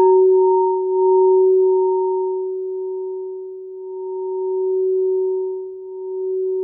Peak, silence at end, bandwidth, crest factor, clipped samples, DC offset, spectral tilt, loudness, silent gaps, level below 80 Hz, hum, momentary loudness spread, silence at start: -6 dBFS; 0 s; 1 kHz; 12 dB; under 0.1%; under 0.1%; -12 dB/octave; -18 LUFS; none; -78 dBFS; none; 16 LU; 0 s